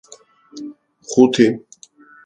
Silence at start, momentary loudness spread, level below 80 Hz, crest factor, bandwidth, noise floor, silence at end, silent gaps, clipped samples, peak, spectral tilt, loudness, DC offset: 0.55 s; 22 LU; -62 dBFS; 20 dB; 9.2 kHz; -47 dBFS; 0.65 s; none; under 0.1%; 0 dBFS; -5 dB/octave; -15 LUFS; under 0.1%